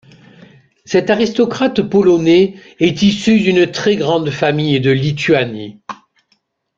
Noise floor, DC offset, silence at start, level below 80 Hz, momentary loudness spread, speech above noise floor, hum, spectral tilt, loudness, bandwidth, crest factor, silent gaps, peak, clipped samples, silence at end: -62 dBFS; under 0.1%; 0.9 s; -50 dBFS; 10 LU; 49 dB; none; -6 dB/octave; -14 LUFS; 7.8 kHz; 14 dB; none; 0 dBFS; under 0.1%; 0.85 s